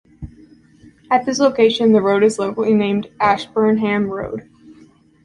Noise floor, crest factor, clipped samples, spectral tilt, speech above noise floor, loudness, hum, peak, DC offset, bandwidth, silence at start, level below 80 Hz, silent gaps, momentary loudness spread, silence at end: -49 dBFS; 16 dB; under 0.1%; -5.5 dB/octave; 33 dB; -16 LUFS; none; -2 dBFS; under 0.1%; 11 kHz; 0.2 s; -50 dBFS; none; 15 LU; 0.5 s